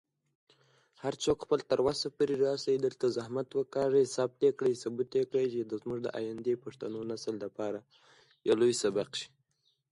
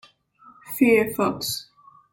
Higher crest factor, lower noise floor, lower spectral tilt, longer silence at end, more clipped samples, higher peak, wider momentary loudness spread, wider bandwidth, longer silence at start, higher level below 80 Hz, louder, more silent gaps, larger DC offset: about the same, 16 dB vs 18 dB; first, -76 dBFS vs -53 dBFS; about the same, -5 dB/octave vs -4 dB/octave; first, 0.65 s vs 0.5 s; neither; second, -16 dBFS vs -6 dBFS; second, 10 LU vs 13 LU; second, 11.5 kHz vs 17 kHz; first, 1.05 s vs 0.65 s; second, -68 dBFS vs -60 dBFS; second, -32 LUFS vs -22 LUFS; neither; neither